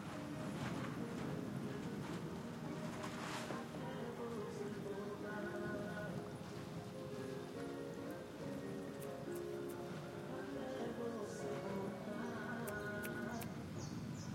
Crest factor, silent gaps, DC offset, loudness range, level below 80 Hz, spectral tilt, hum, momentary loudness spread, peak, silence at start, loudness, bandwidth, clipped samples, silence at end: 18 dB; none; under 0.1%; 2 LU; -72 dBFS; -6 dB/octave; none; 4 LU; -26 dBFS; 0 s; -46 LUFS; 16.5 kHz; under 0.1%; 0 s